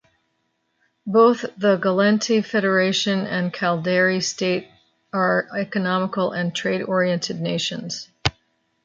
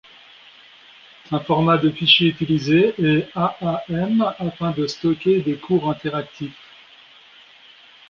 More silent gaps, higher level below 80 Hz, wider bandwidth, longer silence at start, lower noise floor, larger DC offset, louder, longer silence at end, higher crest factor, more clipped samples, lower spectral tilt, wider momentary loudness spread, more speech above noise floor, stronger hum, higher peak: neither; about the same, -54 dBFS vs -56 dBFS; about the same, 7.8 kHz vs 7.2 kHz; second, 1.05 s vs 1.3 s; first, -71 dBFS vs -48 dBFS; neither; about the same, -21 LUFS vs -19 LUFS; second, 0.55 s vs 1.6 s; about the same, 20 dB vs 20 dB; neither; second, -4.5 dB/octave vs -6.5 dB/octave; second, 8 LU vs 13 LU; first, 51 dB vs 29 dB; neither; about the same, -2 dBFS vs -2 dBFS